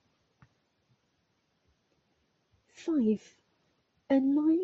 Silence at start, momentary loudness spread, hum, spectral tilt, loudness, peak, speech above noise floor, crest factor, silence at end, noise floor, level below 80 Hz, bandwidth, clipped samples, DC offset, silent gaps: 2.8 s; 9 LU; none; -7 dB/octave; -29 LUFS; -16 dBFS; 49 dB; 18 dB; 0 s; -76 dBFS; -76 dBFS; 7.6 kHz; under 0.1%; under 0.1%; none